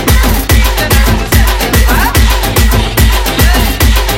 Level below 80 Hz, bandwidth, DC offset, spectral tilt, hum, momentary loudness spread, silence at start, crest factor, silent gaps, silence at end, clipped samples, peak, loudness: -10 dBFS; 17 kHz; under 0.1%; -4 dB/octave; none; 1 LU; 0 s; 8 dB; none; 0 s; 1%; 0 dBFS; -9 LUFS